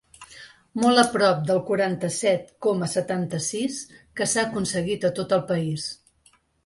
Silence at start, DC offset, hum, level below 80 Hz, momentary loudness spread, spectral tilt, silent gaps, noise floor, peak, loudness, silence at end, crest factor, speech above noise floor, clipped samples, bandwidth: 0.2 s; under 0.1%; none; -60 dBFS; 15 LU; -4.5 dB/octave; none; -61 dBFS; -4 dBFS; -24 LUFS; 0.7 s; 20 dB; 38 dB; under 0.1%; 11.5 kHz